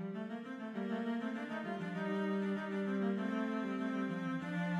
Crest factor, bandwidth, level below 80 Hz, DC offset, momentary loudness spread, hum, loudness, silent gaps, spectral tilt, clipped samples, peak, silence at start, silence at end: 12 dB; 9.2 kHz; -82 dBFS; under 0.1%; 6 LU; none; -39 LUFS; none; -7.5 dB/octave; under 0.1%; -26 dBFS; 0 s; 0 s